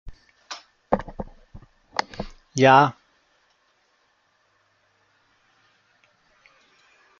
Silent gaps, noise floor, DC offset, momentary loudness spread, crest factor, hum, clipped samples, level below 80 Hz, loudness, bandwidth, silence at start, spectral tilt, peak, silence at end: none; -66 dBFS; under 0.1%; 24 LU; 26 dB; none; under 0.1%; -50 dBFS; -21 LUFS; 7.6 kHz; 0.05 s; -5 dB/octave; -2 dBFS; 4.3 s